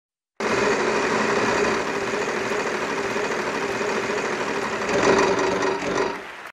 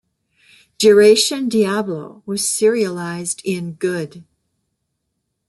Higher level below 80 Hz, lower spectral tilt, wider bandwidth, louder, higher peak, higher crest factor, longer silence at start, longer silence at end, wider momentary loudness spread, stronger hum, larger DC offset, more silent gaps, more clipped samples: first, -52 dBFS vs -64 dBFS; about the same, -3.5 dB/octave vs -3.5 dB/octave; about the same, 13.5 kHz vs 12.5 kHz; second, -23 LUFS vs -17 LUFS; second, -6 dBFS vs -2 dBFS; about the same, 18 dB vs 18 dB; second, 0.4 s vs 0.8 s; second, 0 s vs 1.25 s; second, 6 LU vs 16 LU; neither; neither; neither; neither